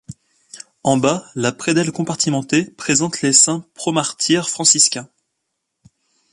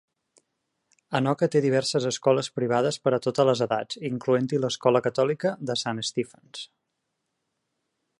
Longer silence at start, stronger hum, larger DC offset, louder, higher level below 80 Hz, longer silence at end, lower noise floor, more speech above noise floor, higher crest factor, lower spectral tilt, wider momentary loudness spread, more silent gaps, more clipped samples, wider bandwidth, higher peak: second, 0.1 s vs 1.1 s; neither; neither; first, -16 LUFS vs -25 LUFS; first, -60 dBFS vs -70 dBFS; second, 1.3 s vs 1.55 s; second, -75 dBFS vs -80 dBFS; about the same, 58 dB vs 55 dB; about the same, 20 dB vs 20 dB; second, -3 dB/octave vs -5 dB/octave; about the same, 10 LU vs 9 LU; neither; neither; about the same, 11.5 kHz vs 11.5 kHz; first, 0 dBFS vs -6 dBFS